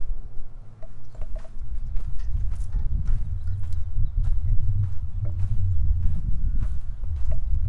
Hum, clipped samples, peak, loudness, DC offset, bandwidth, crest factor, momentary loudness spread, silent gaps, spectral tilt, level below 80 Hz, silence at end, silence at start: none; under 0.1%; -6 dBFS; -30 LUFS; under 0.1%; 1.6 kHz; 12 dB; 15 LU; none; -9 dB/octave; -26 dBFS; 0 s; 0 s